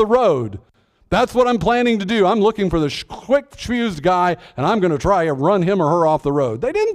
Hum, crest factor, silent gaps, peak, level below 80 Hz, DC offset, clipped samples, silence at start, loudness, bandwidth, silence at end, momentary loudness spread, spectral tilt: none; 14 dB; none; -4 dBFS; -40 dBFS; under 0.1%; under 0.1%; 0 s; -17 LUFS; 13.5 kHz; 0 s; 6 LU; -6.5 dB/octave